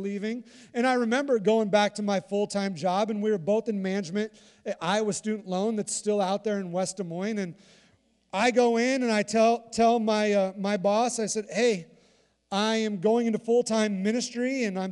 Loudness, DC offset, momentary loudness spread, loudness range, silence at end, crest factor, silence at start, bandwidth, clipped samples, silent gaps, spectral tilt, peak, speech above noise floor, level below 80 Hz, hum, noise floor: -26 LUFS; under 0.1%; 9 LU; 4 LU; 0 s; 16 dB; 0 s; 11.5 kHz; under 0.1%; none; -4.5 dB/octave; -10 dBFS; 38 dB; -72 dBFS; none; -64 dBFS